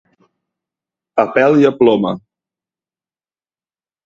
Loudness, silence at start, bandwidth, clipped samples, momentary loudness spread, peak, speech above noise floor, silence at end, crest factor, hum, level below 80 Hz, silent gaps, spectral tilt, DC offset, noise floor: -13 LUFS; 1.15 s; 7.4 kHz; under 0.1%; 11 LU; 0 dBFS; over 78 dB; 1.85 s; 18 dB; none; -58 dBFS; none; -7.5 dB/octave; under 0.1%; under -90 dBFS